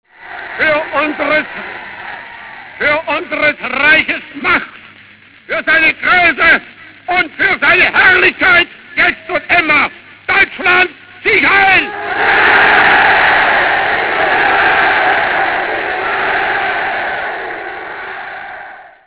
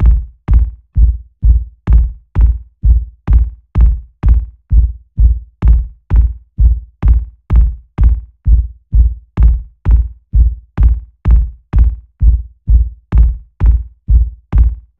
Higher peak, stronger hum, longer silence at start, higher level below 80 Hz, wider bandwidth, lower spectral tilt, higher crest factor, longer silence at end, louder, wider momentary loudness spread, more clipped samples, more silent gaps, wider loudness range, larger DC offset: about the same, 0 dBFS vs 0 dBFS; neither; first, 0.2 s vs 0 s; second, -44 dBFS vs -12 dBFS; first, 4 kHz vs 2.3 kHz; second, -6 dB/octave vs -11 dB/octave; about the same, 12 dB vs 12 dB; about the same, 0.2 s vs 0.2 s; first, -10 LUFS vs -15 LUFS; first, 18 LU vs 4 LU; second, under 0.1% vs 0.2%; neither; first, 7 LU vs 1 LU; neither